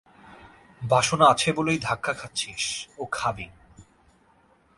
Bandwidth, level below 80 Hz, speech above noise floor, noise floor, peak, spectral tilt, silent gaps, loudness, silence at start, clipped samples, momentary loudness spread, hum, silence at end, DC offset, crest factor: 11.5 kHz; -56 dBFS; 36 dB; -61 dBFS; -4 dBFS; -3.5 dB/octave; none; -24 LUFS; 0.25 s; under 0.1%; 15 LU; none; 0.95 s; under 0.1%; 24 dB